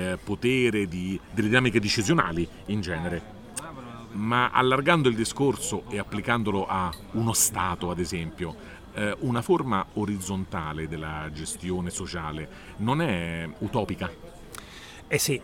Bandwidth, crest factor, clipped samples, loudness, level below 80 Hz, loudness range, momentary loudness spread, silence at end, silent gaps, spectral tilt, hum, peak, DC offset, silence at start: 18.5 kHz; 22 dB; under 0.1%; -27 LUFS; -48 dBFS; 6 LU; 15 LU; 0 s; none; -4.5 dB/octave; none; -4 dBFS; under 0.1%; 0 s